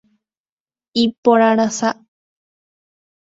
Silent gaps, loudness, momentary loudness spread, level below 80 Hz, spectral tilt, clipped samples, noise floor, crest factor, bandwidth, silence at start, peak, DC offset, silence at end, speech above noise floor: 1.18-1.23 s; -16 LUFS; 10 LU; -64 dBFS; -4 dB/octave; under 0.1%; under -90 dBFS; 20 dB; 8 kHz; 0.95 s; 0 dBFS; under 0.1%; 1.4 s; over 75 dB